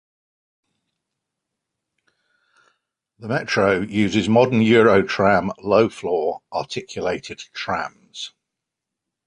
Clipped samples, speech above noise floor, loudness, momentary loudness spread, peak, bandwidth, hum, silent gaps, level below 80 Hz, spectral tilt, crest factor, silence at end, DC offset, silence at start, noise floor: under 0.1%; 65 dB; -19 LUFS; 18 LU; -4 dBFS; 10 kHz; none; none; -54 dBFS; -6 dB/octave; 18 dB; 1 s; under 0.1%; 3.2 s; -84 dBFS